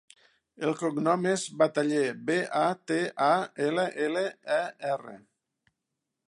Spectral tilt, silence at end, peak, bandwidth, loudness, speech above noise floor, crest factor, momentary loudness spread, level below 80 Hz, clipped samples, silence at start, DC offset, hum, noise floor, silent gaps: -5 dB/octave; 1.1 s; -10 dBFS; 11.5 kHz; -28 LUFS; 57 dB; 20 dB; 7 LU; -80 dBFS; under 0.1%; 0.6 s; under 0.1%; none; -85 dBFS; none